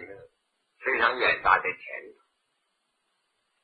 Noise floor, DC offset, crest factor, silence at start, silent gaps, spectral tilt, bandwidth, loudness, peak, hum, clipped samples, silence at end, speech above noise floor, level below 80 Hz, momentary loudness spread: -76 dBFS; under 0.1%; 24 dB; 0 s; none; -5.5 dB/octave; 9.6 kHz; -24 LUFS; -6 dBFS; none; under 0.1%; 1.5 s; 51 dB; -60 dBFS; 18 LU